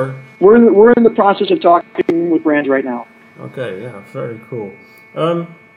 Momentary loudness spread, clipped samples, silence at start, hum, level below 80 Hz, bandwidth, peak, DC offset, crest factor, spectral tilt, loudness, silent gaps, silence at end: 19 LU; under 0.1%; 0 s; none; -54 dBFS; 4.9 kHz; 0 dBFS; under 0.1%; 14 dB; -8.5 dB/octave; -12 LUFS; none; 0.25 s